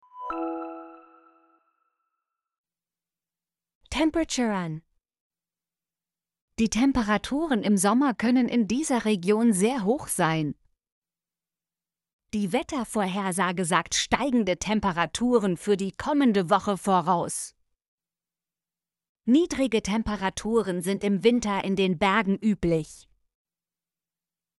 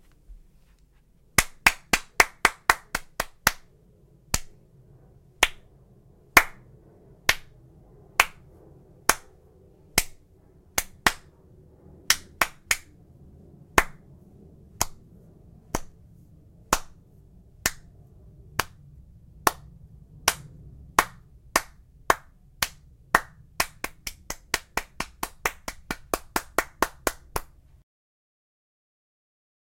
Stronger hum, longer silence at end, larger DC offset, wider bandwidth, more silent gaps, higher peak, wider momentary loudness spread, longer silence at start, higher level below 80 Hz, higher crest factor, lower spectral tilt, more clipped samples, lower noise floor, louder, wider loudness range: neither; second, 1.6 s vs 2.35 s; neither; second, 12 kHz vs 16.5 kHz; first, 2.58-2.64 s, 3.75-3.81 s, 5.21-5.30 s, 6.41-6.48 s, 10.92-11.02 s, 12.13-12.19 s, 17.88-17.98 s, 19.09-19.15 s vs none; second, -6 dBFS vs 0 dBFS; second, 10 LU vs 14 LU; second, 0.15 s vs 0.3 s; second, -52 dBFS vs -46 dBFS; second, 22 dB vs 30 dB; first, -4.5 dB/octave vs -1.5 dB/octave; neither; first, under -90 dBFS vs -59 dBFS; about the same, -25 LUFS vs -26 LUFS; about the same, 8 LU vs 9 LU